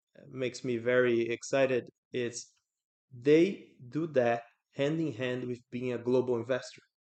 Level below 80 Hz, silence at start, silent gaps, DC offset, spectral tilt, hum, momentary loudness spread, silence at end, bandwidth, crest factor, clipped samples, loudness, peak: -76 dBFS; 0.35 s; 1.98-2.11 s, 2.84-3.08 s; under 0.1%; -5.5 dB/octave; none; 13 LU; 0.3 s; 9 kHz; 18 dB; under 0.1%; -31 LUFS; -14 dBFS